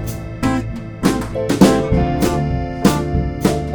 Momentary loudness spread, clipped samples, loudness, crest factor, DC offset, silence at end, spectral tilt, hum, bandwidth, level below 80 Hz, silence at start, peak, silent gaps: 9 LU; 0.1%; -17 LUFS; 16 dB; under 0.1%; 0 s; -6 dB/octave; none; over 20 kHz; -28 dBFS; 0 s; 0 dBFS; none